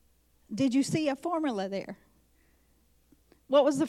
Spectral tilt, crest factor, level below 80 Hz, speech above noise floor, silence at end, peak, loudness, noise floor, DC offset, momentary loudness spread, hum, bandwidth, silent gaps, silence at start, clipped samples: -5.5 dB/octave; 18 dB; -68 dBFS; 39 dB; 0 s; -12 dBFS; -29 LUFS; -66 dBFS; under 0.1%; 17 LU; none; 13.5 kHz; none; 0.5 s; under 0.1%